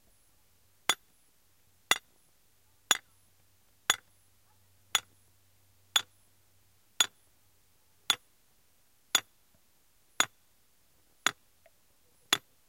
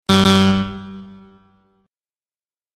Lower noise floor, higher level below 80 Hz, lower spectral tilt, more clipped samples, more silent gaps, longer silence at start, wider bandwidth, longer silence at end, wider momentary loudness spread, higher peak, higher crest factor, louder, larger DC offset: second, -70 dBFS vs under -90 dBFS; second, -76 dBFS vs -46 dBFS; second, 1.5 dB/octave vs -5.5 dB/octave; neither; neither; first, 0.9 s vs 0.1 s; first, 16.5 kHz vs 13 kHz; second, 0.3 s vs 1.7 s; second, 3 LU vs 23 LU; second, -4 dBFS vs 0 dBFS; first, 34 dB vs 20 dB; second, -31 LUFS vs -15 LUFS; neither